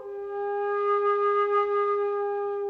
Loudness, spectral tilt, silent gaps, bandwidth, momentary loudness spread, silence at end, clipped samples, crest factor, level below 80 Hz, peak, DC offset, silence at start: -26 LUFS; -5 dB/octave; none; 4.5 kHz; 7 LU; 0 s; under 0.1%; 10 dB; -74 dBFS; -16 dBFS; under 0.1%; 0 s